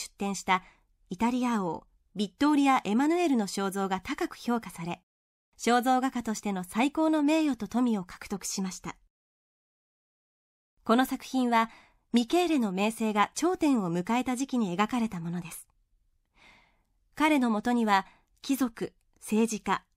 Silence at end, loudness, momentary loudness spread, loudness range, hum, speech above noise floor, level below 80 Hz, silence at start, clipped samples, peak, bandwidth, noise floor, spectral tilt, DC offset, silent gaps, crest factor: 0.15 s; -28 LUFS; 13 LU; 5 LU; none; 43 dB; -62 dBFS; 0 s; under 0.1%; -10 dBFS; 16 kHz; -71 dBFS; -4.5 dB/octave; under 0.1%; 5.03-5.52 s, 9.10-10.77 s; 20 dB